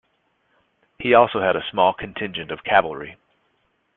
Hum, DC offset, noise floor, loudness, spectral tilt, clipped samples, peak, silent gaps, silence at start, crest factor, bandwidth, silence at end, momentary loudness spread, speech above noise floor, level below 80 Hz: none; under 0.1%; -68 dBFS; -20 LUFS; -9 dB/octave; under 0.1%; -2 dBFS; none; 1 s; 22 dB; 4.1 kHz; 0.85 s; 14 LU; 48 dB; -58 dBFS